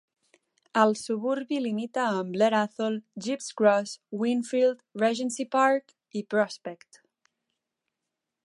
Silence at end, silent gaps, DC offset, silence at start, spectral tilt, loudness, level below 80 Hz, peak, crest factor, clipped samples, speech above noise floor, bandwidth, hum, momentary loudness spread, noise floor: 1.7 s; none; under 0.1%; 0.75 s; -4.5 dB/octave; -27 LUFS; -82 dBFS; -6 dBFS; 22 dB; under 0.1%; 59 dB; 11.5 kHz; none; 10 LU; -86 dBFS